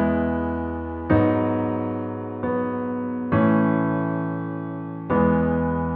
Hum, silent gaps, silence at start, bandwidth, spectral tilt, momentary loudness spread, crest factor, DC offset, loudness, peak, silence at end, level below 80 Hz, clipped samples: none; none; 0 s; 4.2 kHz; -12.5 dB/octave; 10 LU; 16 dB; under 0.1%; -23 LUFS; -6 dBFS; 0 s; -42 dBFS; under 0.1%